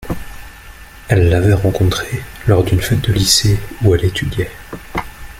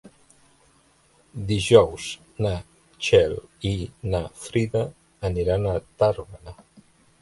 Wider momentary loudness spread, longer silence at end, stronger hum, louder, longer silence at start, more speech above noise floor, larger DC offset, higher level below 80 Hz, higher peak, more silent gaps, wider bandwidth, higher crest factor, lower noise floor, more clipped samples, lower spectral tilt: about the same, 15 LU vs 17 LU; second, 0 s vs 0.7 s; neither; first, -15 LUFS vs -24 LUFS; about the same, 0 s vs 0.05 s; second, 22 dB vs 37 dB; neither; first, -30 dBFS vs -42 dBFS; about the same, 0 dBFS vs -2 dBFS; neither; first, 16 kHz vs 11.5 kHz; second, 16 dB vs 24 dB; second, -36 dBFS vs -60 dBFS; neither; about the same, -5 dB/octave vs -5.5 dB/octave